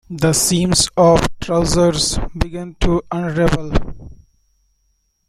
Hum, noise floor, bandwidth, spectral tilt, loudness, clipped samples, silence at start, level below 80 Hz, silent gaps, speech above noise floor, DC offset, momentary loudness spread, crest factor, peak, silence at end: none; -64 dBFS; 16 kHz; -4.5 dB/octave; -16 LUFS; under 0.1%; 0.1 s; -28 dBFS; none; 49 dB; under 0.1%; 11 LU; 16 dB; 0 dBFS; 1.15 s